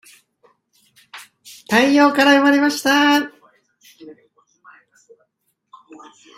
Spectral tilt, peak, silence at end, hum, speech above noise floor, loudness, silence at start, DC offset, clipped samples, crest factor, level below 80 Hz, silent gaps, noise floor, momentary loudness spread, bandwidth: -3 dB/octave; 0 dBFS; 2.25 s; none; 56 dB; -14 LUFS; 1.15 s; under 0.1%; under 0.1%; 20 dB; -64 dBFS; none; -70 dBFS; 26 LU; 16 kHz